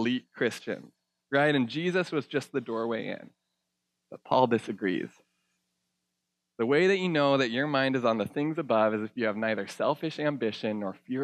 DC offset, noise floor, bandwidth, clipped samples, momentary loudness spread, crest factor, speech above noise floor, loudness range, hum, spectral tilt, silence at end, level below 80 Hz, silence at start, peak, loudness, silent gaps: under 0.1%; -83 dBFS; 13.5 kHz; under 0.1%; 10 LU; 20 dB; 55 dB; 5 LU; none; -6 dB/octave; 0 s; -82 dBFS; 0 s; -8 dBFS; -28 LUFS; none